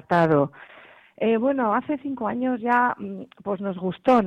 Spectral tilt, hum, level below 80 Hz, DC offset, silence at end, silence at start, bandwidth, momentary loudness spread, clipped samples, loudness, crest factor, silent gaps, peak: -8.5 dB/octave; none; -62 dBFS; under 0.1%; 0 s; 0.1 s; 8.4 kHz; 10 LU; under 0.1%; -24 LUFS; 16 dB; none; -8 dBFS